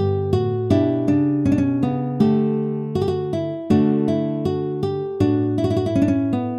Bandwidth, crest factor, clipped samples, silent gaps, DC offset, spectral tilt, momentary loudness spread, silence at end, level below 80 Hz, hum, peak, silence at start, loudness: 11 kHz; 16 dB; under 0.1%; none; under 0.1%; -9 dB/octave; 5 LU; 0 s; -50 dBFS; none; -4 dBFS; 0 s; -20 LUFS